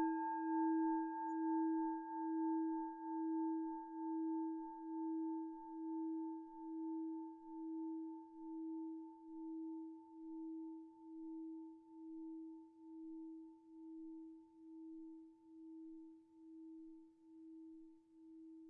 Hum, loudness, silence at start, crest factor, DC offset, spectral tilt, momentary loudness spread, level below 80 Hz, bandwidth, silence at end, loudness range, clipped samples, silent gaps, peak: none; -45 LUFS; 0 s; 16 dB; under 0.1%; 1 dB/octave; 19 LU; -90 dBFS; 1.7 kHz; 0 s; 16 LU; under 0.1%; none; -30 dBFS